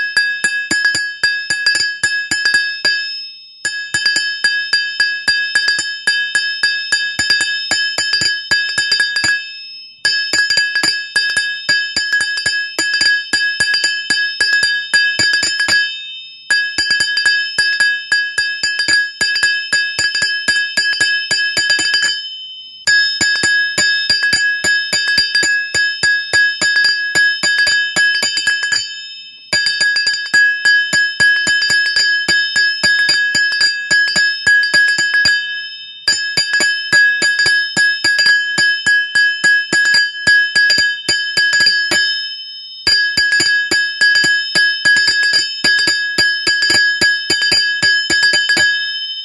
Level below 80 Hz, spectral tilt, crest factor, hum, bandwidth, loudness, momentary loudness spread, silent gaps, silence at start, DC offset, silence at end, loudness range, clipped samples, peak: -52 dBFS; 0.5 dB/octave; 14 dB; none; 12 kHz; -12 LUFS; 5 LU; none; 0 s; under 0.1%; 0 s; 3 LU; under 0.1%; 0 dBFS